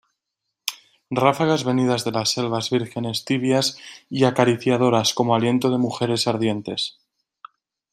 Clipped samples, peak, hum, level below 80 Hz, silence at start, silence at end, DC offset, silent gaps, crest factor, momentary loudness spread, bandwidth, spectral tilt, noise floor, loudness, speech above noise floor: under 0.1%; -2 dBFS; none; -64 dBFS; 0.65 s; 1.05 s; under 0.1%; none; 20 dB; 11 LU; 15.5 kHz; -5 dB/octave; -81 dBFS; -21 LUFS; 60 dB